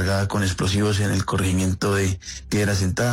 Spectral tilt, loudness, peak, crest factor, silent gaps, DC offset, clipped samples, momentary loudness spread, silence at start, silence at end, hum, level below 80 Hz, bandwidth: -5 dB/octave; -22 LUFS; -10 dBFS; 10 dB; none; under 0.1%; under 0.1%; 3 LU; 0 s; 0 s; none; -44 dBFS; 15.5 kHz